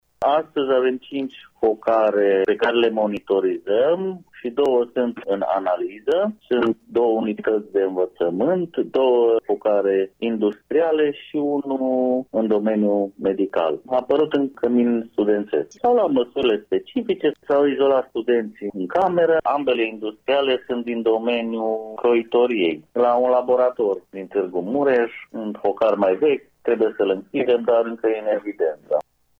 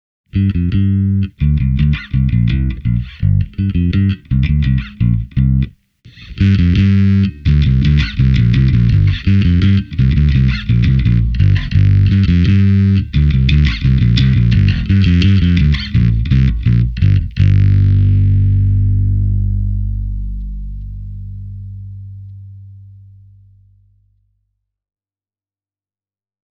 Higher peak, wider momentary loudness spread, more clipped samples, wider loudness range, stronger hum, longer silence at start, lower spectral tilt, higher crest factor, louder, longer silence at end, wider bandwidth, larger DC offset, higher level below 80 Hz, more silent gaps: second, -6 dBFS vs 0 dBFS; second, 6 LU vs 14 LU; neither; second, 2 LU vs 10 LU; second, none vs 50 Hz at -30 dBFS; second, 0.2 s vs 0.35 s; second, -7 dB/octave vs -8.5 dB/octave; about the same, 14 dB vs 12 dB; second, -21 LUFS vs -13 LUFS; second, 0.4 s vs 3.75 s; about the same, 6.4 kHz vs 6 kHz; neither; second, -64 dBFS vs -20 dBFS; neither